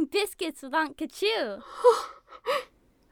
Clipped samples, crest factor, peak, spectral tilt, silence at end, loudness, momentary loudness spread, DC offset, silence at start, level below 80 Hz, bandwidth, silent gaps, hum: under 0.1%; 20 dB; -8 dBFS; -2 dB/octave; 0.5 s; -28 LUFS; 12 LU; under 0.1%; 0 s; -66 dBFS; 19.5 kHz; none; none